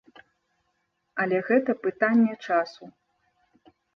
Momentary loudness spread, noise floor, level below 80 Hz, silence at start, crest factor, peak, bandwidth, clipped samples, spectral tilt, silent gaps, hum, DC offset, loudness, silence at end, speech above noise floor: 9 LU; -75 dBFS; -76 dBFS; 1.15 s; 18 dB; -8 dBFS; 6.4 kHz; under 0.1%; -7.5 dB/octave; none; none; under 0.1%; -25 LUFS; 1.05 s; 51 dB